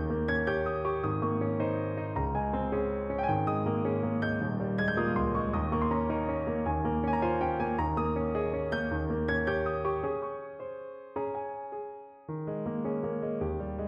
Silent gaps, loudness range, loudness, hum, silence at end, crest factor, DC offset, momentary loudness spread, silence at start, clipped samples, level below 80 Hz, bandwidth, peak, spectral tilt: none; 6 LU; -31 LUFS; none; 0 s; 14 dB; under 0.1%; 10 LU; 0 s; under 0.1%; -44 dBFS; 6.6 kHz; -16 dBFS; -9.5 dB/octave